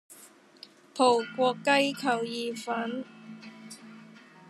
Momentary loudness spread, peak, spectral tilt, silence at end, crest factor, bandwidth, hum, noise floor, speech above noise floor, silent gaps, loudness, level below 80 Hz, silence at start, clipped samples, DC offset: 22 LU; -8 dBFS; -3.5 dB/octave; 0.4 s; 22 dB; 13.5 kHz; none; -54 dBFS; 27 dB; none; -27 LUFS; -90 dBFS; 0.1 s; under 0.1%; under 0.1%